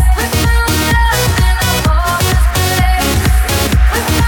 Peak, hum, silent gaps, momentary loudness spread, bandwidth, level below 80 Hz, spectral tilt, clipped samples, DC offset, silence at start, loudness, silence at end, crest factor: -2 dBFS; none; none; 1 LU; 19.5 kHz; -14 dBFS; -4 dB/octave; under 0.1%; under 0.1%; 0 s; -12 LUFS; 0 s; 10 dB